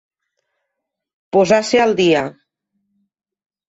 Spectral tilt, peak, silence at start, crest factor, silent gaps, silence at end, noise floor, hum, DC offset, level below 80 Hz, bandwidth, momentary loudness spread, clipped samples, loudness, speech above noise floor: -4.5 dB/octave; -2 dBFS; 1.35 s; 18 dB; none; 1.35 s; -79 dBFS; none; under 0.1%; -58 dBFS; 8.2 kHz; 6 LU; under 0.1%; -15 LUFS; 65 dB